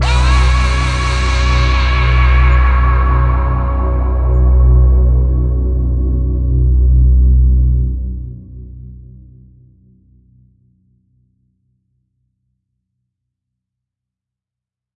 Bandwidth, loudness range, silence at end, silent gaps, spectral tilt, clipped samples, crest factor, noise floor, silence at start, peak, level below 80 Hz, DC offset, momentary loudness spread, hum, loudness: 8.8 kHz; 7 LU; 5.95 s; none; -6 dB/octave; under 0.1%; 12 dB; -85 dBFS; 0 s; 0 dBFS; -14 dBFS; under 0.1%; 10 LU; none; -13 LUFS